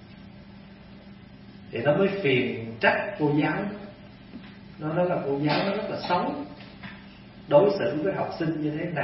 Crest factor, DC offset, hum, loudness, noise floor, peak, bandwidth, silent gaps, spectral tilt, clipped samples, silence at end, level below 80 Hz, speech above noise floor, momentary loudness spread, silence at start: 22 dB; under 0.1%; none; -26 LUFS; -47 dBFS; -6 dBFS; 5.8 kHz; none; -10.5 dB/octave; under 0.1%; 0 s; -58 dBFS; 22 dB; 24 LU; 0 s